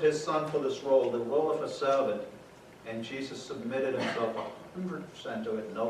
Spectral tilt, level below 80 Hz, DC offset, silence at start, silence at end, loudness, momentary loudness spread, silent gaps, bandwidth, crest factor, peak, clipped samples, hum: -5 dB/octave; -70 dBFS; under 0.1%; 0 s; 0 s; -32 LUFS; 13 LU; none; 13 kHz; 16 dB; -14 dBFS; under 0.1%; none